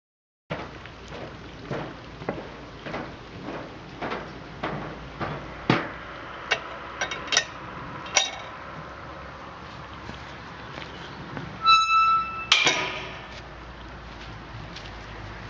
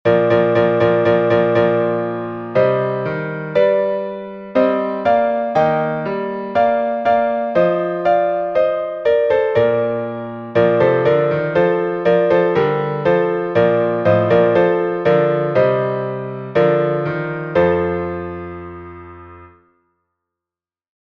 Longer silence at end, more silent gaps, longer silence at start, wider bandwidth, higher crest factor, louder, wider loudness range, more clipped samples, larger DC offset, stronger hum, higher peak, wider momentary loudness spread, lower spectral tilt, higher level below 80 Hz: second, 0 s vs 1.7 s; neither; first, 0.5 s vs 0.05 s; first, 10 kHz vs 6.2 kHz; first, 30 dB vs 14 dB; second, -26 LUFS vs -16 LUFS; first, 14 LU vs 4 LU; neither; neither; neither; about the same, 0 dBFS vs -2 dBFS; first, 21 LU vs 9 LU; second, -2.5 dB/octave vs -8.5 dB/octave; about the same, -50 dBFS vs -52 dBFS